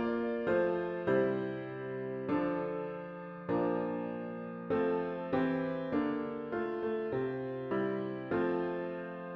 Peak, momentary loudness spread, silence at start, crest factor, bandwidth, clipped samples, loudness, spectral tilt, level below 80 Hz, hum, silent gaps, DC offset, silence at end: -18 dBFS; 9 LU; 0 s; 16 dB; 5.6 kHz; under 0.1%; -35 LUFS; -9.5 dB/octave; -66 dBFS; none; none; under 0.1%; 0 s